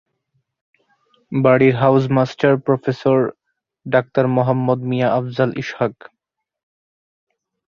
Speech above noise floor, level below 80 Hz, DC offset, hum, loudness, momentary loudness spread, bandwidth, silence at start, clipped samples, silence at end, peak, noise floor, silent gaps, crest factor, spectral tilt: 63 dB; -58 dBFS; under 0.1%; none; -17 LUFS; 10 LU; 7 kHz; 1.3 s; under 0.1%; 1.85 s; -2 dBFS; -79 dBFS; none; 18 dB; -8.5 dB/octave